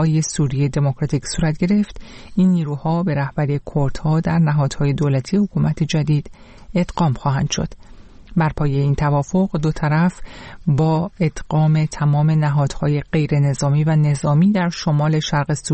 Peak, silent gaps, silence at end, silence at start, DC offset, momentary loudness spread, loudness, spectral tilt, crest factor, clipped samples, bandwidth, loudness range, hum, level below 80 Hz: -6 dBFS; none; 0 s; 0 s; under 0.1%; 6 LU; -19 LUFS; -6.5 dB/octave; 12 dB; under 0.1%; 8.8 kHz; 3 LU; none; -38 dBFS